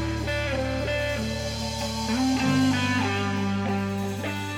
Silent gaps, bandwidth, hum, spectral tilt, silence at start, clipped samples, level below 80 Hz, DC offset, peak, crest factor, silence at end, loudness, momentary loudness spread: none; 17 kHz; none; -5 dB/octave; 0 s; under 0.1%; -42 dBFS; under 0.1%; -12 dBFS; 14 dB; 0 s; -26 LUFS; 7 LU